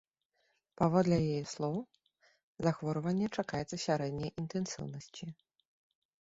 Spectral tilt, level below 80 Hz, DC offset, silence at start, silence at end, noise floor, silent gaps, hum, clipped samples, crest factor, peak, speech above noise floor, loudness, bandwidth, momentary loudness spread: -6.5 dB/octave; -64 dBFS; under 0.1%; 0.8 s; 0.85 s; -79 dBFS; 2.43-2.55 s; none; under 0.1%; 20 dB; -16 dBFS; 45 dB; -35 LUFS; 8 kHz; 15 LU